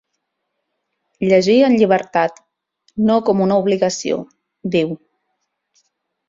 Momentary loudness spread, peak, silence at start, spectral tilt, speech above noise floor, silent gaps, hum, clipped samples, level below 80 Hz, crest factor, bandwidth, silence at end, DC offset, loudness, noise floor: 12 LU; -2 dBFS; 1.2 s; -5.5 dB/octave; 60 dB; none; none; under 0.1%; -58 dBFS; 16 dB; 7.8 kHz; 1.3 s; under 0.1%; -16 LUFS; -75 dBFS